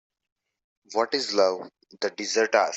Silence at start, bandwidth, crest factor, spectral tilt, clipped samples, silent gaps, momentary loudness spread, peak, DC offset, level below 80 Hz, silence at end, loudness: 0.9 s; 8.2 kHz; 20 dB; -1.5 dB/octave; under 0.1%; none; 11 LU; -8 dBFS; under 0.1%; -76 dBFS; 0 s; -25 LUFS